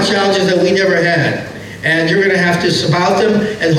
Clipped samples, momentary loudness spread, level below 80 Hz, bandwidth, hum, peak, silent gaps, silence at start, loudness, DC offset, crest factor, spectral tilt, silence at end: under 0.1%; 5 LU; -48 dBFS; 14 kHz; none; -4 dBFS; none; 0 s; -13 LUFS; under 0.1%; 8 dB; -5 dB/octave; 0 s